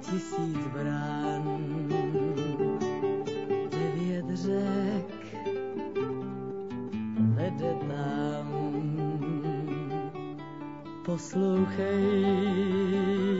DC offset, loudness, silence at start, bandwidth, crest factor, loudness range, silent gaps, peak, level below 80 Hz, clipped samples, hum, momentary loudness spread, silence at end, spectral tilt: 0.2%; -31 LUFS; 0 s; 7.8 kHz; 14 dB; 3 LU; none; -14 dBFS; -66 dBFS; under 0.1%; none; 10 LU; 0 s; -7.5 dB/octave